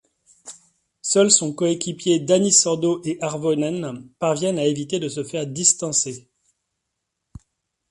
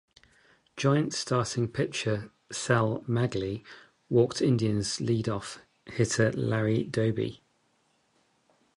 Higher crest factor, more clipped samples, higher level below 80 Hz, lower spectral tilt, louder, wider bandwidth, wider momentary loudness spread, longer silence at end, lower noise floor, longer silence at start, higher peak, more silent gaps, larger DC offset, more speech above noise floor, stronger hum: about the same, 22 dB vs 20 dB; neither; about the same, -60 dBFS vs -58 dBFS; second, -3.5 dB/octave vs -5.5 dB/octave; first, -20 LUFS vs -28 LUFS; about the same, 11.5 kHz vs 11.5 kHz; first, 15 LU vs 10 LU; first, 1.7 s vs 1.4 s; first, -79 dBFS vs -70 dBFS; second, 0.45 s vs 0.75 s; first, -2 dBFS vs -10 dBFS; neither; neither; first, 58 dB vs 43 dB; neither